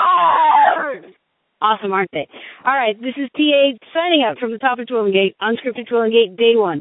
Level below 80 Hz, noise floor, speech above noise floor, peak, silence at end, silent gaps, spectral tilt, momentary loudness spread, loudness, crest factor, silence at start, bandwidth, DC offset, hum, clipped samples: -66 dBFS; -59 dBFS; 42 dB; 0 dBFS; 0 s; none; -9.5 dB/octave; 11 LU; -16 LUFS; 16 dB; 0 s; 4 kHz; under 0.1%; none; under 0.1%